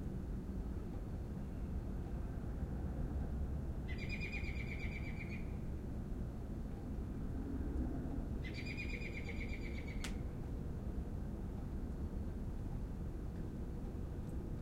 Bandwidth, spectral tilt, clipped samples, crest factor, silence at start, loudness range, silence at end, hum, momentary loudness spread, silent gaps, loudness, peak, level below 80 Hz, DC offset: 15.5 kHz; -7 dB/octave; under 0.1%; 14 dB; 0 s; 2 LU; 0 s; none; 4 LU; none; -45 LUFS; -28 dBFS; -46 dBFS; under 0.1%